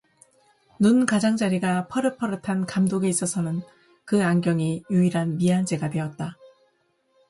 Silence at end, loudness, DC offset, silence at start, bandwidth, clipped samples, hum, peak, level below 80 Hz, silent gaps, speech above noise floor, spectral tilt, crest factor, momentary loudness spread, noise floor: 0.85 s; -23 LUFS; under 0.1%; 0.8 s; 11.5 kHz; under 0.1%; none; -4 dBFS; -62 dBFS; none; 45 dB; -6 dB/octave; 20 dB; 9 LU; -68 dBFS